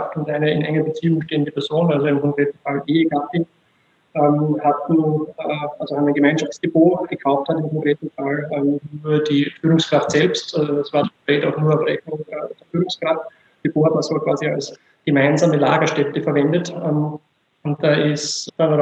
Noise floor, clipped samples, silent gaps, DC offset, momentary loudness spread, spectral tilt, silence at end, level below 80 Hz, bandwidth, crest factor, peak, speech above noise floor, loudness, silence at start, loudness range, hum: -60 dBFS; under 0.1%; none; under 0.1%; 9 LU; -6 dB/octave; 0 s; -64 dBFS; 8.4 kHz; 18 dB; -2 dBFS; 42 dB; -19 LUFS; 0 s; 2 LU; none